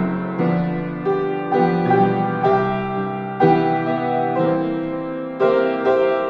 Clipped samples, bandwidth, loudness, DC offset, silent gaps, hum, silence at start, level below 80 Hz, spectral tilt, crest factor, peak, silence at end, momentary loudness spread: under 0.1%; 6.2 kHz; -19 LUFS; under 0.1%; none; none; 0 s; -52 dBFS; -9.5 dB/octave; 16 dB; -2 dBFS; 0 s; 7 LU